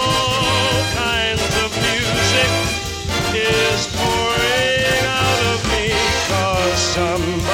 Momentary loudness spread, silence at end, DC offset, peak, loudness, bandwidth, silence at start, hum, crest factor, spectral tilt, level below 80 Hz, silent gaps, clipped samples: 4 LU; 0 s; under 0.1%; -4 dBFS; -17 LUFS; 17 kHz; 0 s; none; 14 dB; -3 dB/octave; -34 dBFS; none; under 0.1%